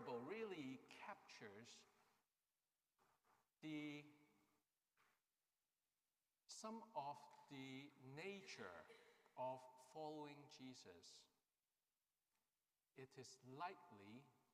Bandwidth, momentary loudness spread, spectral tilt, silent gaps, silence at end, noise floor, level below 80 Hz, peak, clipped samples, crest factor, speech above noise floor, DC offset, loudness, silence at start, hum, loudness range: 15 kHz; 12 LU; -4.5 dB/octave; none; 0.15 s; under -90 dBFS; under -90 dBFS; -38 dBFS; under 0.1%; 20 dB; over 33 dB; under 0.1%; -57 LUFS; 0 s; none; 6 LU